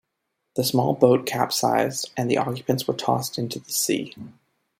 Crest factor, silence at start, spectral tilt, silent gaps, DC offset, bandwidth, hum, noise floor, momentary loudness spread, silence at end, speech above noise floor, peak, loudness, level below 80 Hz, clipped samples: 22 dB; 0.55 s; -4.5 dB/octave; none; under 0.1%; 16.5 kHz; none; -78 dBFS; 10 LU; 0.5 s; 55 dB; -2 dBFS; -23 LUFS; -66 dBFS; under 0.1%